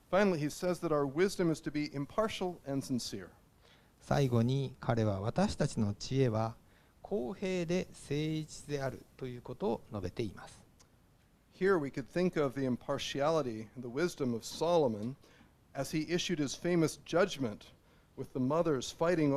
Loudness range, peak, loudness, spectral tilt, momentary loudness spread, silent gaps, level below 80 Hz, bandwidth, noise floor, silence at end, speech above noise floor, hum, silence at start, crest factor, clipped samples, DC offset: 5 LU; -14 dBFS; -34 LUFS; -6 dB/octave; 11 LU; none; -58 dBFS; 15 kHz; -66 dBFS; 0 s; 33 dB; none; 0.1 s; 20 dB; under 0.1%; under 0.1%